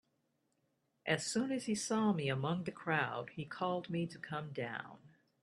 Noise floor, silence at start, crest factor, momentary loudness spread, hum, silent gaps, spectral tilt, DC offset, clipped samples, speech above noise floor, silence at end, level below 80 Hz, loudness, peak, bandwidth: -81 dBFS; 1.05 s; 22 dB; 10 LU; none; none; -5 dB/octave; under 0.1%; under 0.1%; 43 dB; 0.35 s; -78 dBFS; -38 LUFS; -18 dBFS; 12.5 kHz